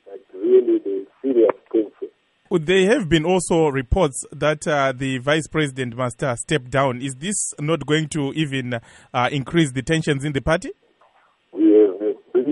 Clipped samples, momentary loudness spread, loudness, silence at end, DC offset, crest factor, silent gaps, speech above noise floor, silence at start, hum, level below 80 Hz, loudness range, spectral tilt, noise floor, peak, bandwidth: under 0.1%; 10 LU; -20 LUFS; 0 s; under 0.1%; 16 dB; none; 37 dB; 0.05 s; none; -42 dBFS; 3 LU; -5 dB/octave; -58 dBFS; -4 dBFS; 11.5 kHz